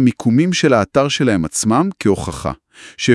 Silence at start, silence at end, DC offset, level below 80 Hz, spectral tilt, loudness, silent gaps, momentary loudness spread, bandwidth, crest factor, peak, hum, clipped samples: 0 s; 0 s; under 0.1%; -44 dBFS; -5 dB/octave; -16 LUFS; none; 11 LU; 12 kHz; 16 dB; 0 dBFS; none; under 0.1%